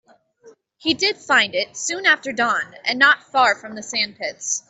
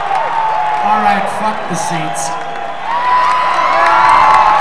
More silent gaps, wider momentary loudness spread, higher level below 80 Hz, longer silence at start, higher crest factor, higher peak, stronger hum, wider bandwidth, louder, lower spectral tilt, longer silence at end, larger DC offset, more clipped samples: neither; about the same, 9 LU vs 11 LU; second, -68 dBFS vs -46 dBFS; first, 0.45 s vs 0 s; first, 18 dB vs 12 dB; about the same, -2 dBFS vs 0 dBFS; neither; second, 8.4 kHz vs 11 kHz; second, -19 LUFS vs -12 LUFS; second, -0.5 dB/octave vs -3 dB/octave; about the same, 0.1 s vs 0 s; second, under 0.1% vs 5%; second, under 0.1% vs 0.3%